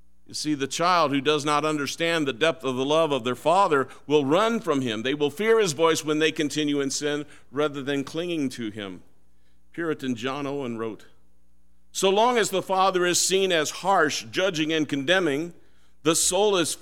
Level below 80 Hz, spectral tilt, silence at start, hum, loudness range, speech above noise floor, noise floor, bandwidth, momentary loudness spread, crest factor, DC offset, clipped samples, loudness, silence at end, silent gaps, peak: -64 dBFS; -3 dB/octave; 0.3 s; none; 8 LU; 41 dB; -65 dBFS; 16.5 kHz; 10 LU; 18 dB; 0.5%; under 0.1%; -24 LUFS; 0.05 s; none; -6 dBFS